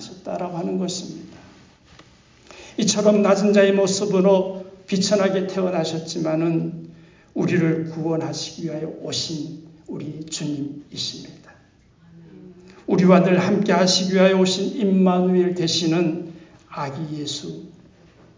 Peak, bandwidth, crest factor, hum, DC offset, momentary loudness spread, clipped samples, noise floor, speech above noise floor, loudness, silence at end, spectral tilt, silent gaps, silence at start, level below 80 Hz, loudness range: -2 dBFS; 7.6 kHz; 20 dB; none; under 0.1%; 17 LU; under 0.1%; -54 dBFS; 34 dB; -20 LUFS; 0.65 s; -5 dB/octave; none; 0 s; -62 dBFS; 11 LU